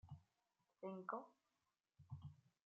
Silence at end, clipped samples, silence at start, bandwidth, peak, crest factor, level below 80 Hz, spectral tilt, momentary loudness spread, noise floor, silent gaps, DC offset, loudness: 0.15 s; under 0.1%; 0.05 s; 7 kHz; -34 dBFS; 24 dB; -84 dBFS; -7.5 dB/octave; 14 LU; under -90 dBFS; none; under 0.1%; -55 LUFS